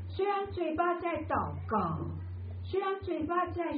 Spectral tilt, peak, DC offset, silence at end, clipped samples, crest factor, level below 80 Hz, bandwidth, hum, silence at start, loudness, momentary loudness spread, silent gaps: -6 dB/octave; -18 dBFS; under 0.1%; 0 s; under 0.1%; 16 dB; -56 dBFS; 5 kHz; none; 0 s; -33 LUFS; 8 LU; none